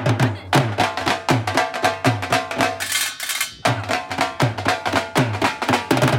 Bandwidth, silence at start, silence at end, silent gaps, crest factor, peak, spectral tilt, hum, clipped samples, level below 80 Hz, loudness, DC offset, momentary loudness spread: 17 kHz; 0 s; 0 s; none; 16 dB; -4 dBFS; -4.5 dB/octave; none; under 0.1%; -52 dBFS; -20 LUFS; under 0.1%; 3 LU